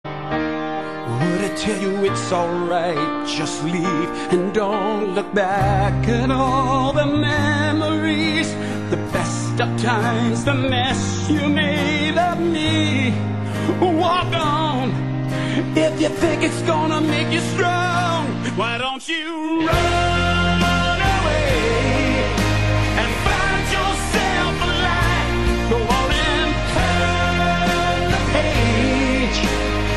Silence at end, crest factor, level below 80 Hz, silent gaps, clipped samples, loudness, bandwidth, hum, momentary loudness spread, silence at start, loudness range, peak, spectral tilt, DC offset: 0 s; 16 dB; -30 dBFS; none; under 0.1%; -19 LUFS; 13.5 kHz; none; 5 LU; 0.05 s; 2 LU; -4 dBFS; -5 dB/octave; 0.9%